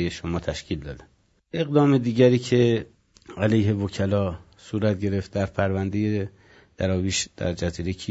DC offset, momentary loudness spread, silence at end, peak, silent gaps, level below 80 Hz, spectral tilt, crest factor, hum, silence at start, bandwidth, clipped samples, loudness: under 0.1%; 14 LU; 0 s; -4 dBFS; none; -50 dBFS; -6 dB/octave; 20 dB; none; 0 s; 8 kHz; under 0.1%; -24 LUFS